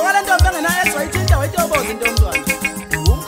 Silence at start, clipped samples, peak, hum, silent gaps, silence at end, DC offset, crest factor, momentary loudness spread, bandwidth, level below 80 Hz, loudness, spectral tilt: 0 s; under 0.1%; 0 dBFS; none; none; 0 s; under 0.1%; 16 dB; 5 LU; 16.5 kHz; -22 dBFS; -16 LUFS; -4 dB/octave